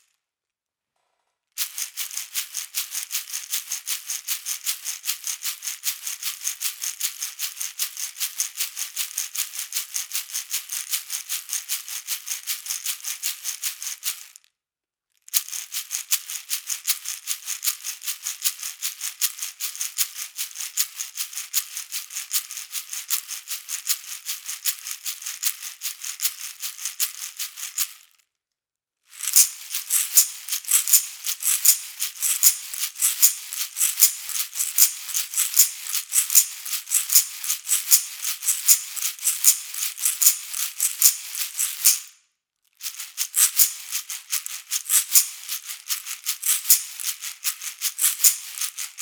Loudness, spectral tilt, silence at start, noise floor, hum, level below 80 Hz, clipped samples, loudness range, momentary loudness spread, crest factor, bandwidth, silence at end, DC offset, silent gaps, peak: -22 LUFS; 7.5 dB/octave; 1.55 s; under -90 dBFS; none; -88 dBFS; under 0.1%; 9 LU; 13 LU; 26 dB; over 20 kHz; 0 s; under 0.1%; none; 0 dBFS